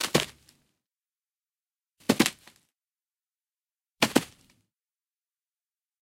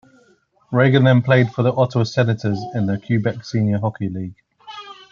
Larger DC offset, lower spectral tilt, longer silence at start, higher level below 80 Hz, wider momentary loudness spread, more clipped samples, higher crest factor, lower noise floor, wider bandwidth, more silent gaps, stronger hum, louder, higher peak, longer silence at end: neither; second, -3 dB/octave vs -8 dB/octave; second, 0 s vs 0.7 s; second, -64 dBFS vs -58 dBFS; second, 12 LU vs 19 LU; neither; first, 30 dB vs 16 dB; first, under -90 dBFS vs -57 dBFS; first, 16.5 kHz vs 7 kHz; neither; neither; second, -27 LUFS vs -18 LUFS; about the same, -4 dBFS vs -2 dBFS; first, 1.75 s vs 0.2 s